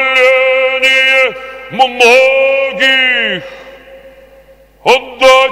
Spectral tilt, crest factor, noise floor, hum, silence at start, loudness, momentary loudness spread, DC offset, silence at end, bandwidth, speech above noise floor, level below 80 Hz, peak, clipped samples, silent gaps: -1.5 dB/octave; 10 dB; -42 dBFS; none; 0 s; -8 LUFS; 11 LU; under 0.1%; 0 s; 15.5 kHz; 34 dB; -48 dBFS; 0 dBFS; 0.6%; none